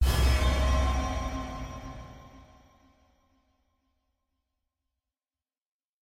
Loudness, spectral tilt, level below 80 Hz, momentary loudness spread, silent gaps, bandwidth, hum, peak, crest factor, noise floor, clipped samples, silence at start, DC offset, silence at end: -29 LUFS; -5 dB/octave; -32 dBFS; 21 LU; none; 16 kHz; none; -14 dBFS; 18 dB; under -90 dBFS; under 0.1%; 0 s; under 0.1%; 3.65 s